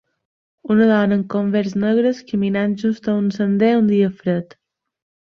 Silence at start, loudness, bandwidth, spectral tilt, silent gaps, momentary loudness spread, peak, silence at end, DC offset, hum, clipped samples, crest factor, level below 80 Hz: 0.65 s; -18 LUFS; 6.6 kHz; -8 dB/octave; none; 7 LU; -4 dBFS; 0.95 s; under 0.1%; none; under 0.1%; 14 dB; -60 dBFS